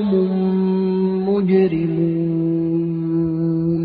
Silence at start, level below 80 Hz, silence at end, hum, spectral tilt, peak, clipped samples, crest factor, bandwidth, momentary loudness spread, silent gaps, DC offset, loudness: 0 s; -52 dBFS; 0 s; none; -13 dB/octave; -4 dBFS; under 0.1%; 12 dB; 4.7 kHz; 4 LU; none; under 0.1%; -19 LUFS